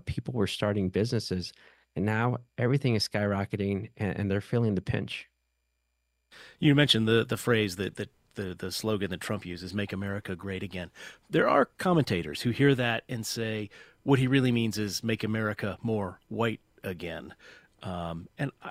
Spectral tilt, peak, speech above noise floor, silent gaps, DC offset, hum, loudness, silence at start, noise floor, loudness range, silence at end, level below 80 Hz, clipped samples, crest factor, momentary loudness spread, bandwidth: -5.5 dB/octave; -8 dBFS; 49 dB; none; under 0.1%; none; -29 LUFS; 0.05 s; -78 dBFS; 6 LU; 0 s; -58 dBFS; under 0.1%; 22 dB; 14 LU; 16 kHz